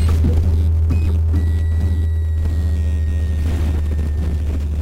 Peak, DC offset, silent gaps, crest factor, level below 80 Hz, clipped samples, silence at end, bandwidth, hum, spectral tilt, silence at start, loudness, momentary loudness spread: -6 dBFS; under 0.1%; none; 10 dB; -18 dBFS; under 0.1%; 0 s; 8.4 kHz; none; -8 dB/octave; 0 s; -19 LUFS; 4 LU